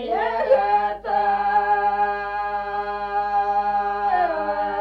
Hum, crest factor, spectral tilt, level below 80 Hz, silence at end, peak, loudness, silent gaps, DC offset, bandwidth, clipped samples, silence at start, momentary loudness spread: 50 Hz at -50 dBFS; 14 dB; -5.5 dB/octave; -50 dBFS; 0 s; -6 dBFS; -22 LUFS; none; under 0.1%; 5.6 kHz; under 0.1%; 0 s; 6 LU